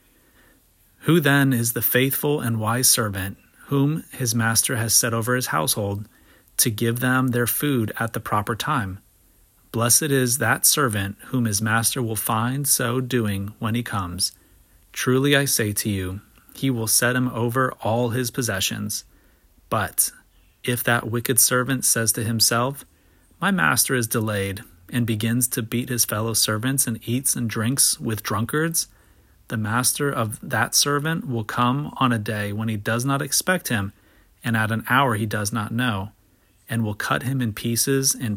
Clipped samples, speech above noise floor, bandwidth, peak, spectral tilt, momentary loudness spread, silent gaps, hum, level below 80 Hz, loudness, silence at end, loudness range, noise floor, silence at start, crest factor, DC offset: under 0.1%; 37 dB; 17 kHz; -2 dBFS; -3.5 dB/octave; 10 LU; none; none; -56 dBFS; -21 LUFS; 0 s; 4 LU; -59 dBFS; 1.05 s; 22 dB; under 0.1%